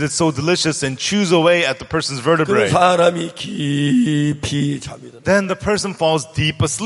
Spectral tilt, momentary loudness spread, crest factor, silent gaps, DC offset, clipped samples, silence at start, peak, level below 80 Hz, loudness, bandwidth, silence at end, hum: -4.5 dB/octave; 9 LU; 16 dB; none; under 0.1%; under 0.1%; 0 s; 0 dBFS; -46 dBFS; -17 LUFS; 11.5 kHz; 0 s; none